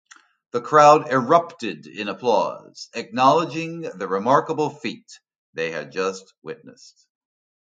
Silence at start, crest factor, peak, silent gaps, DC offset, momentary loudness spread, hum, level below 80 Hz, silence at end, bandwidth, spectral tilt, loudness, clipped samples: 0.55 s; 22 dB; 0 dBFS; 5.38-5.53 s, 6.38-6.42 s; under 0.1%; 23 LU; none; -72 dBFS; 0.95 s; 9 kHz; -5 dB/octave; -21 LUFS; under 0.1%